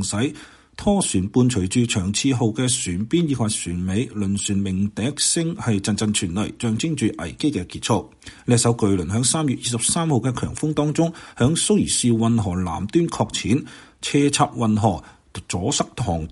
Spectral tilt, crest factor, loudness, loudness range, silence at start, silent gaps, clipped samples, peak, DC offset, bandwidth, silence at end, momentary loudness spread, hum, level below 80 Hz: -4.5 dB/octave; 18 dB; -21 LUFS; 2 LU; 0 s; none; under 0.1%; -4 dBFS; under 0.1%; 11.5 kHz; 0 s; 7 LU; none; -46 dBFS